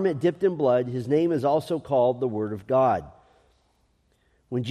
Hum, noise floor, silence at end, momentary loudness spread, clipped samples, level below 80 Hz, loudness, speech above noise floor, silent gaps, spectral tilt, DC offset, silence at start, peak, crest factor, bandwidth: none; -67 dBFS; 0 s; 8 LU; under 0.1%; -62 dBFS; -24 LUFS; 43 dB; none; -8 dB/octave; under 0.1%; 0 s; -10 dBFS; 14 dB; 13 kHz